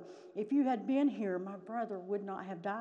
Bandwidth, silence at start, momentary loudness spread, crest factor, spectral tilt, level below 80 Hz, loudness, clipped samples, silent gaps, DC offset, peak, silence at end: 7.2 kHz; 0 s; 10 LU; 12 dB; -8 dB/octave; under -90 dBFS; -36 LUFS; under 0.1%; none; under 0.1%; -22 dBFS; 0 s